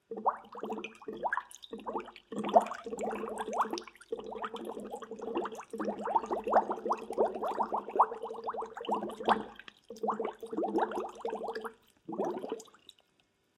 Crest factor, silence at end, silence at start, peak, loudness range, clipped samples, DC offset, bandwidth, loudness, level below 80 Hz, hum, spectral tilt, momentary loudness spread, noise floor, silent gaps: 28 dB; 0.95 s; 0.1 s; -8 dBFS; 5 LU; under 0.1%; under 0.1%; 15 kHz; -35 LUFS; -72 dBFS; none; -5 dB/octave; 14 LU; -73 dBFS; none